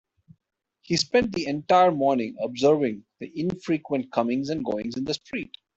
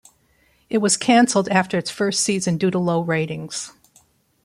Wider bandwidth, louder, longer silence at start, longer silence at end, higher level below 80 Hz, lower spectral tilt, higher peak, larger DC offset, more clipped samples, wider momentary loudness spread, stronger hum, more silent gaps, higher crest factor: second, 8.2 kHz vs 15 kHz; second, -25 LUFS vs -20 LUFS; first, 0.9 s vs 0.7 s; second, 0.3 s vs 0.75 s; about the same, -60 dBFS vs -62 dBFS; about the same, -5 dB/octave vs -4 dB/octave; about the same, -6 dBFS vs -4 dBFS; neither; neither; about the same, 11 LU vs 12 LU; neither; neither; about the same, 18 dB vs 18 dB